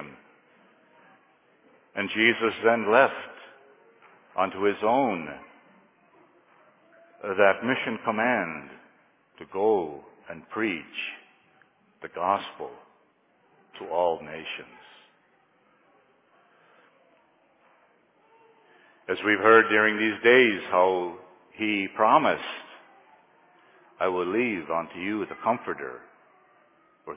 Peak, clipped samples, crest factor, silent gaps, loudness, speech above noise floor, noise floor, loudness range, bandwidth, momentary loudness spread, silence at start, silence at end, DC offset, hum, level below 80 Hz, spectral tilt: -4 dBFS; under 0.1%; 24 dB; none; -24 LUFS; 40 dB; -65 dBFS; 13 LU; 3.9 kHz; 21 LU; 0 s; 0 s; under 0.1%; none; -70 dBFS; -8 dB/octave